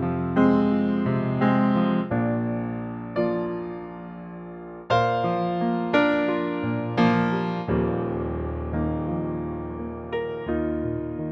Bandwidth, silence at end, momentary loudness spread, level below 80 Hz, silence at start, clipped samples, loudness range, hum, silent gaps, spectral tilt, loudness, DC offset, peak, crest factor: 6.8 kHz; 0 s; 12 LU; -44 dBFS; 0 s; under 0.1%; 5 LU; none; none; -8.5 dB/octave; -25 LUFS; under 0.1%; -6 dBFS; 18 dB